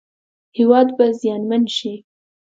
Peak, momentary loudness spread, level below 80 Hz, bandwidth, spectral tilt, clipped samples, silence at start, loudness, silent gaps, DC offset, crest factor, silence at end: 0 dBFS; 17 LU; -70 dBFS; 7.8 kHz; -5.5 dB/octave; under 0.1%; 0.55 s; -17 LUFS; none; under 0.1%; 18 dB; 0.45 s